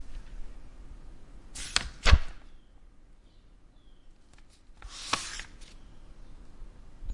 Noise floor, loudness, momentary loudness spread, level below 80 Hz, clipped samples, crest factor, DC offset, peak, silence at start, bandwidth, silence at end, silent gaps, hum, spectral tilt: -55 dBFS; -30 LUFS; 29 LU; -36 dBFS; under 0.1%; 28 dB; under 0.1%; -4 dBFS; 0 s; 11.5 kHz; 0 s; none; none; -3 dB/octave